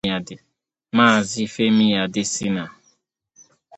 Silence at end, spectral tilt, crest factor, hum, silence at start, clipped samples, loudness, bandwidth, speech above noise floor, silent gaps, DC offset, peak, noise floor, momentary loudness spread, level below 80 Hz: 1.05 s; -4 dB/octave; 20 dB; none; 0.05 s; under 0.1%; -19 LUFS; 8.8 kHz; 45 dB; none; under 0.1%; -2 dBFS; -64 dBFS; 12 LU; -58 dBFS